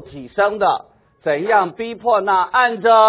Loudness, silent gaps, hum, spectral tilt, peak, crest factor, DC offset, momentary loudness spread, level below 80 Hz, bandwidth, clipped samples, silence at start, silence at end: -17 LUFS; none; none; -8 dB/octave; 0 dBFS; 16 dB; under 0.1%; 10 LU; -56 dBFS; 4 kHz; under 0.1%; 0 s; 0 s